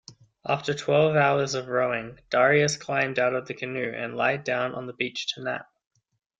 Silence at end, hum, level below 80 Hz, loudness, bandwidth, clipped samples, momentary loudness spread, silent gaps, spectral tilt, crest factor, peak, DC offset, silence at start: 0.75 s; none; -66 dBFS; -25 LUFS; 9.4 kHz; under 0.1%; 11 LU; none; -4.5 dB/octave; 18 dB; -8 dBFS; under 0.1%; 0.1 s